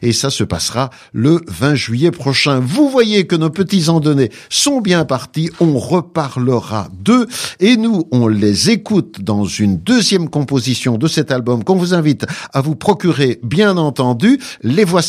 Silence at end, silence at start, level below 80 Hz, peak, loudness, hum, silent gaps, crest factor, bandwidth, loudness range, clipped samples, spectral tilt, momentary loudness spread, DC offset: 0 s; 0 s; -48 dBFS; 0 dBFS; -14 LUFS; none; none; 14 dB; 15.5 kHz; 2 LU; under 0.1%; -5 dB/octave; 6 LU; under 0.1%